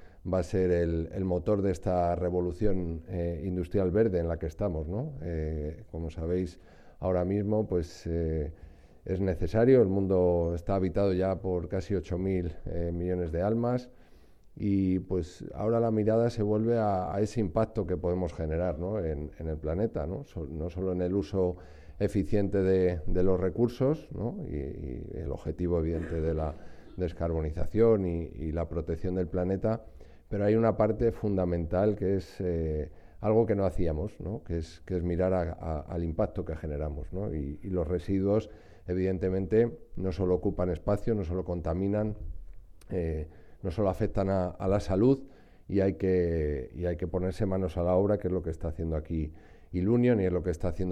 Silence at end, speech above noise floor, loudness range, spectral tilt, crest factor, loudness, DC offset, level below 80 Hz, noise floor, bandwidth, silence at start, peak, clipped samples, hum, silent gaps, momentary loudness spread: 0 s; 25 dB; 5 LU; -9 dB/octave; 18 dB; -30 LUFS; under 0.1%; -42 dBFS; -54 dBFS; 10 kHz; 0 s; -10 dBFS; under 0.1%; none; none; 10 LU